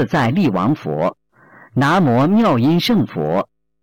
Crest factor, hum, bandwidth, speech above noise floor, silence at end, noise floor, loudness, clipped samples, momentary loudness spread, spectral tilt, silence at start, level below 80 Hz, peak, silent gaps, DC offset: 8 dB; none; 17 kHz; 31 dB; 0.4 s; -47 dBFS; -16 LUFS; under 0.1%; 8 LU; -7 dB/octave; 0 s; -50 dBFS; -10 dBFS; none; under 0.1%